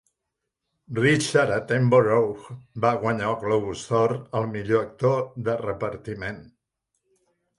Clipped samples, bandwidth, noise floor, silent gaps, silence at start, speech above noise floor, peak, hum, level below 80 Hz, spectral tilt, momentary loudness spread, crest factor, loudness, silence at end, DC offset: under 0.1%; 11.5 kHz; -82 dBFS; none; 0.9 s; 59 dB; -6 dBFS; none; -56 dBFS; -6 dB/octave; 14 LU; 20 dB; -24 LUFS; 1.15 s; under 0.1%